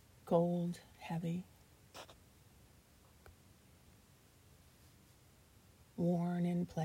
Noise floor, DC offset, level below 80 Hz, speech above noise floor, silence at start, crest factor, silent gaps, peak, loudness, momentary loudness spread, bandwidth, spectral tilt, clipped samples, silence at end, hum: -65 dBFS; under 0.1%; -70 dBFS; 29 dB; 0.25 s; 24 dB; none; -18 dBFS; -38 LUFS; 21 LU; 15.5 kHz; -8 dB/octave; under 0.1%; 0 s; none